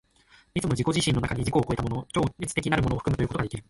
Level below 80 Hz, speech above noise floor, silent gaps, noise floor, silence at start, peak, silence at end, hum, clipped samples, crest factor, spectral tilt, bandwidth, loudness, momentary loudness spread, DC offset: -42 dBFS; 33 dB; none; -59 dBFS; 0.55 s; -8 dBFS; 0.05 s; none; under 0.1%; 18 dB; -5.5 dB/octave; 11.5 kHz; -27 LUFS; 5 LU; under 0.1%